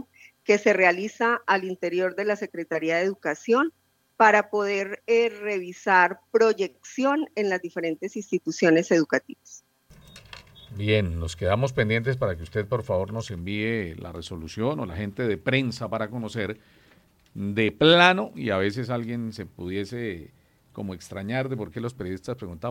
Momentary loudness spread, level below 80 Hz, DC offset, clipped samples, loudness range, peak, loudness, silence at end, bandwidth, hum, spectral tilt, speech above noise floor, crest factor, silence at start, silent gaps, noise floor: 16 LU; -56 dBFS; under 0.1%; under 0.1%; 7 LU; -2 dBFS; -25 LUFS; 0 s; 16 kHz; none; -5.5 dB/octave; 34 dB; 24 dB; 0.5 s; none; -59 dBFS